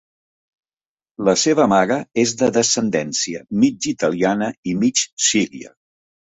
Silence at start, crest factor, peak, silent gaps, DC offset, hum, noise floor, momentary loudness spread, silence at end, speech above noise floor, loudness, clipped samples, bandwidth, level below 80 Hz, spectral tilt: 1.2 s; 18 dB; -2 dBFS; 4.58-4.63 s, 5.13-5.17 s; under 0.1%; none; under -90 dBFS; 7 LU; 0.7 s; over 72 dB; -18 LUFS; under 0.1%; 8.4 kHz; -58 dBFS; -3.5 dB/octave